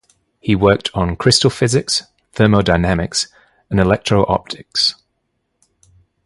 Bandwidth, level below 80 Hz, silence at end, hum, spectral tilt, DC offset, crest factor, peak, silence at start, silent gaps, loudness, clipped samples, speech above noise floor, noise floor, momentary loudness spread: 11.5 kHz; -36 dBFS; 1.35 s; none; -4.5 dB/octave; under 0.1%; 18 dB; 0 dBFS; 0.45 s; none; -16 LUFS; under 0.1%; 55 dB; -70 dBFS; 8 LU